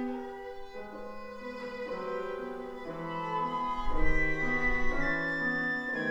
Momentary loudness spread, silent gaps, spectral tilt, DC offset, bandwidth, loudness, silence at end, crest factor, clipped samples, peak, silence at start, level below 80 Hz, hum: 14 LU; none; -6 dB/octave; under 0.1%; 7.4 kHz; -33 LUFS; 0 s; 18 dB; under 0.1%; -14 dBFS; 0 s; -40 dBFS; none